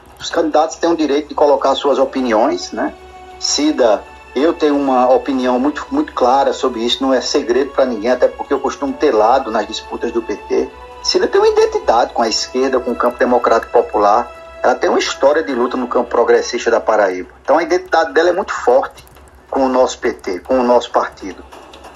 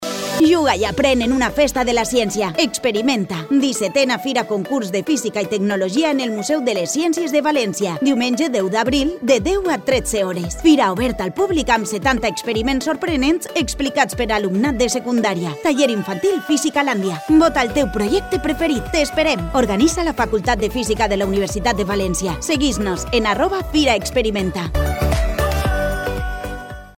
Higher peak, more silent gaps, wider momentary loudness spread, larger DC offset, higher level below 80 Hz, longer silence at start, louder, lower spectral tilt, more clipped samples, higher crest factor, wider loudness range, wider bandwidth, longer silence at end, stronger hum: about the same, 0 dBFS vs -2 dBFS; neither; first, 8 LU vs 5 LU; neither; second, -46 dBFS vs -32 dBFS; first, 0.2 s vs 0 s; first, -15 LUFS vs -18 LUFS; second, -3 dB/octave vs -4.5 dB/octave; neither; about the same, 14 dB vs 16 dB; about the same, 2 LU vs 2 LU; second, 12.5 kHz vs 16.5 kHz; about the same, 0.05 s vs 0.05 s; neither